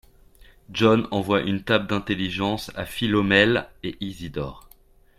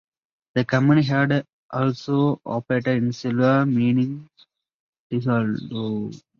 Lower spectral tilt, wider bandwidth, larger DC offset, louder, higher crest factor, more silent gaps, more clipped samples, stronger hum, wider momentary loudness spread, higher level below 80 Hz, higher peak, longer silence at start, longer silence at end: second, -6 dB/octave vs -8 dB/octave; first, 15.5 kHz vs 7 kHz; neither; about the same, -23 LUFS vs -22 LUFS; about the same, 20 dB vs 16 dB; second, none vs 1.53-1.69 s, 4.74-4.93 s, 4.99-5.10 s; neither; neither; first, 15 LU vs 10 LU; first, -48 dBFS vs -60 dBFS; about the same, -4 dBFS vs -6 dBFS; first, 0.7 s vs 0.55 s; first, 0.6 s vs 0.25 s